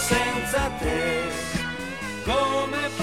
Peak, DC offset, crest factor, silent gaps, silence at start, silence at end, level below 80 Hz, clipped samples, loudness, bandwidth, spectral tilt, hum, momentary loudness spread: -8 dBFS; 0.4%; 18 dB; none; 0 s; 0 s; -38 dBFS; under 0.1%; -25 LUFS; 17 kHz; -3.5 dB/octave; none; 7 LU